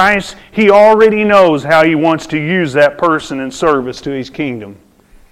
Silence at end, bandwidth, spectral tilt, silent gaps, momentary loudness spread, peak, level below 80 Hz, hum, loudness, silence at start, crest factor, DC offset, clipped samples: 0.6 s; 14 kHz; -5.5 dB/octave; none; 14 LU; 0 dBFS; -44 dBFS; none; -11 LUFS; 0 s; 12 dB; under 0.1%; under 0.1%